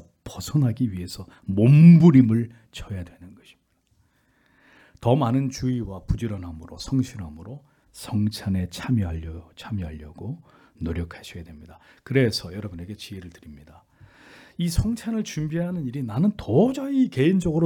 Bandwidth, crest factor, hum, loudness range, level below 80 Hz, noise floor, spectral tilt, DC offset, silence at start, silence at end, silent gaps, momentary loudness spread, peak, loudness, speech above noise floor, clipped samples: 14.5 kHz; 20 dB; none; 11 LU; -44 dBFS; -65 dBFS; -7.5 dB/octave; under 0.1%; 0.25 s; 0 s; none; 21 LU; -4 dBFS; -22 LUFS; 43 dB; under 0.1%